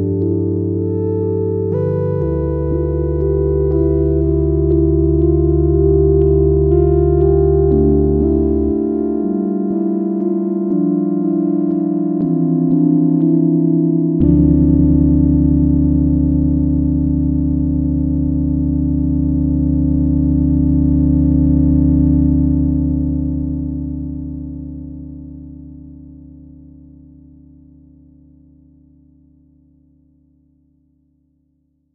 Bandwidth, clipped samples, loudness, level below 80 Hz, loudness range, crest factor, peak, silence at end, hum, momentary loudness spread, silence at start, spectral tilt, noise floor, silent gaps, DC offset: 2 kHz; under 0.1%; -15 LUFS; -22 dBFS; 6 LU; 14 dB; -2 dBFS; 5.55 s; none; 7 LU; 0 s; -15 dB/octave; -63 dBFS; none; under 0.1%